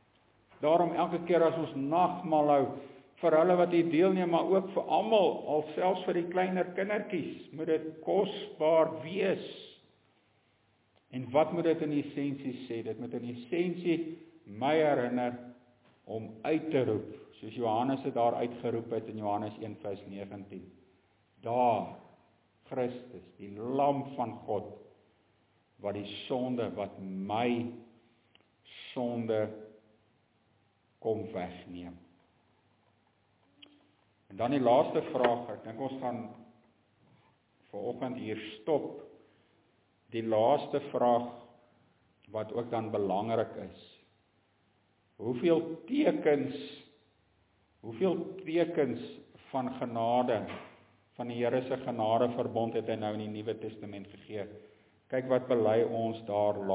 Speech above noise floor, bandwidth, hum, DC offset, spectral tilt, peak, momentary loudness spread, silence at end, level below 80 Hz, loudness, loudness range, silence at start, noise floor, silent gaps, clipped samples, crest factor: 40 dB; 4 kHz; none; under 0.1%; -5.5 dB/octave; -10 dBFS; 18 LU; 0 s; -72 dBFS; -32 LUFS; 10 LU; 0.6 s; -71 dBFS; none; under 0.1%; 22 dB